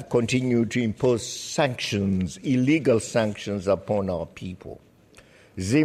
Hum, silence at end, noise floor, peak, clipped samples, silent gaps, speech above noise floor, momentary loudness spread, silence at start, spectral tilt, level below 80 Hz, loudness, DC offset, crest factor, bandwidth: none; 0 s; -53 dBFS; -8 dBFS; under 0.1%; none; 29 dB; 14 LU; 0 s; -5.5 dB/octave; -54 dBFS; -24 LUFS; under 0.1%; 16 dB; 14 kHz